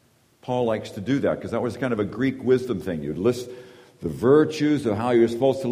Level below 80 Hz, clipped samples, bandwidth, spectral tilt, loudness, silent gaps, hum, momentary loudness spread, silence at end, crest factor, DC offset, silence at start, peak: -56 dBFS; under 0.1%; 15.5 kHz; -7 dB/octave; -23 LUFS; none; none; 13 LU; 0 s; 18 dB; under 0.1%; 0.45 s; -6 dBFS